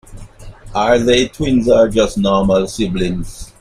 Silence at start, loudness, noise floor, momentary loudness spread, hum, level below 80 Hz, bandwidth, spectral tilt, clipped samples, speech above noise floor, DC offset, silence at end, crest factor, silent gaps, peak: 0.1 s; -14 LUFS; -34 dBFS; 10 LU; none; -32 dBFS; 14.5 kHz; -5.5 dB/octave; under 0.1%; 20 dB; under 0.1%; 0.15 s; 14 dB; none; 0 dBFS